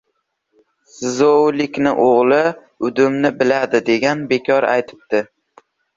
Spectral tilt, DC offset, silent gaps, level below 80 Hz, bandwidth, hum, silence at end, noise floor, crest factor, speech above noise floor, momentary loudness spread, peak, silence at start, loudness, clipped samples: -5 dB/octave; under 0.1%; none; -60 dBFS; 7.8 kHz; none; 0.75 s; -71 dBFS; 14 dB; 55 dB; 9 LU; -2 dBFS; 1 s; -16 LUFS; under 0.1%